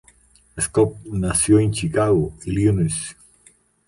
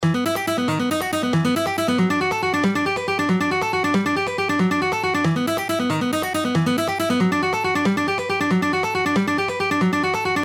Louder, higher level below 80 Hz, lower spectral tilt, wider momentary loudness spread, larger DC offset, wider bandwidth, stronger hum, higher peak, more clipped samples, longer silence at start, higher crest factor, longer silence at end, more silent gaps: about the same, -20 LUFS vs -21 LUFS; first, -40 dBFS vs -54 dBFS; about the same, -5.5 dB/octave vs -5.5 dB/octave; first, 10 LU vs 2 LU; neither; second, 11.5 kHz vs 18.5 kHz; neither; first, -4 dBFS vs -8 dBFS; neither; first, 0.55 s vs 0 s; about the same, 16 dB vs 12 dB; first, 0.75 s vs 0 s; neither